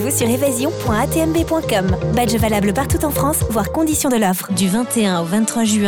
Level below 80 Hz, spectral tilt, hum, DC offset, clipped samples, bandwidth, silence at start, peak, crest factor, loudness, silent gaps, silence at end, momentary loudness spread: -34 dBFS; -5 dB/octave; none; 0.2%; under 0.1%; 19.5 kHz; 0 s; -2 dBFS; 14 dB; -17 LUFS; none; 0 s; 2 LU